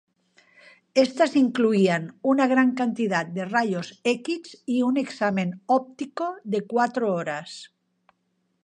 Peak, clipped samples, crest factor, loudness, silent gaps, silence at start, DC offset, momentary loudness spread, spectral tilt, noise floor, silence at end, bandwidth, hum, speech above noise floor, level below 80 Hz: -6 dBFS; under 0.1%; 20 dB; -24 LUFS; none; 0.95 s; under 0.1%; 11 LU; -6 dB/octave; -73 dBFS; 0.95 s; 10 kHz; none; 49 dB; -76 dBFS